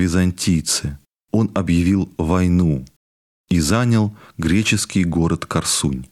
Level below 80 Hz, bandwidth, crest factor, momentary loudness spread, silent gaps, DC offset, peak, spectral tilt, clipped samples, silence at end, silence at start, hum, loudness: -36 dBFS; 14.5 kHz; 16 dB; 5 LU; 2.96-3.44 s; under 0.1%; -2 dBFS; -5 dB/octave; under 0.1%; 0.05 s; 0 s; none; -19 LUFS